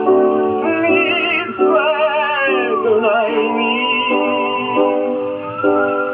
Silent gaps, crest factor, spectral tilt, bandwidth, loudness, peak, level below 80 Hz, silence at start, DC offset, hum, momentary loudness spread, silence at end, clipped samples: none; 14 dB; -1.5 dB/octave; 4.3 kHz; -15 LUFS; -2 dBFS; -64 dBFS; 0 s; under 0.1%; none; 4 LU; 0 s; under 0.1%